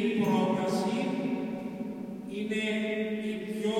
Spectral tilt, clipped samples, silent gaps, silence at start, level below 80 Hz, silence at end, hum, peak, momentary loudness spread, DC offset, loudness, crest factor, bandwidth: -6 dB/octave; under 0.1%; none; 0 s; -70 dBFS; 0 s; none; -16 dBFS; 11 LU; under 0.1%; -31 LUFS; 14 dB; 16 kHz